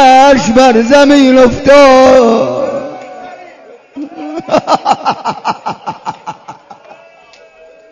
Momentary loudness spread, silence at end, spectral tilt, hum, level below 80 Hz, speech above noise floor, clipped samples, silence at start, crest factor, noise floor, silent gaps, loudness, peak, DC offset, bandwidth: 22 LU; 1.2 s; -4.5 dB/octave; none; -38 dBFS; 33 dB; 2%; 0 s; 10 dB; -40 dBFS; none; -7 LUFS; 0 dBFS; under 0.1%; 11 kHz